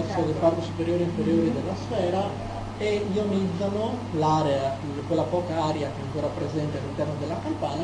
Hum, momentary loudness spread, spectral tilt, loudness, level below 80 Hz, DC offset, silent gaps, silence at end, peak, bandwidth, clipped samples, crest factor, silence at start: none; 6 LU; -7 dB/octave; -27 LUFS; -48 dBFS; under 0.1%; none; 0 s; -8 dBFS; 11 kHz; under 0.1%; 18 dB; 0 s